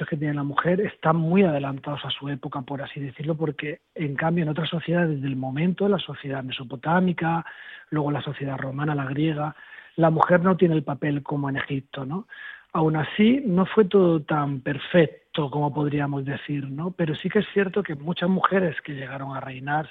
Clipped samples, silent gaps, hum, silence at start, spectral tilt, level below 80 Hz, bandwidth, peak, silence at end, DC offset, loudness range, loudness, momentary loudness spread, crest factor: under 0.1%; none; none; 0 s; -10 dB/octave; -60 dBFS; 4.3 kHz; -2 dBFS; 0 s; under 0.1%; 5 LU; -25 LUFS; 12 LU; 22 dB